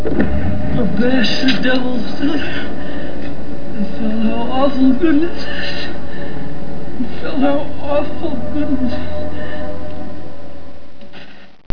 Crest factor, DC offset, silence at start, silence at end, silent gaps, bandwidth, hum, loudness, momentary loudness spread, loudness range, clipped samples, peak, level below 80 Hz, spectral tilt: 16 dB; 30%; 0 s; 0 s; 11.66-11.70 s; 5.4 kHz; none; -19 LUFS; 19 LU; 5 LU; under 0.1%; 0 dBFS; -34 dBFS; -7 dB/octave